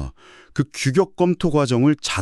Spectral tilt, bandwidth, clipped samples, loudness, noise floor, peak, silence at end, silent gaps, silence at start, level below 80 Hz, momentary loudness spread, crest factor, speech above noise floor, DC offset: -6 dB/octave; 12.5 kHz; under 0.1%; -20 LUFS; -42 dBFS; -4 dBFS; 0 s; none; 0 s; -42 dBFS; 9 LU; 16 dB; 23 dB; under 0.1%